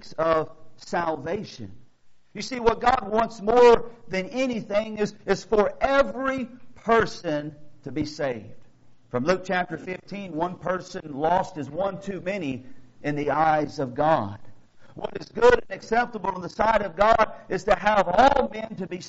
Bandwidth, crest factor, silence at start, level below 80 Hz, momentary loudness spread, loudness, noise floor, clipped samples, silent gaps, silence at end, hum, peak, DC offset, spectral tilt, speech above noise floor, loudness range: 8 kHz; 20 dB; 0.05 s; -46 dBFS; 16 LU; -24 LUFS; -51 dBFS; under 0.1%; none; 0 s; none; -4 dBFS; under 0.1%; -4 dB/octave; 28 dB; 7 LU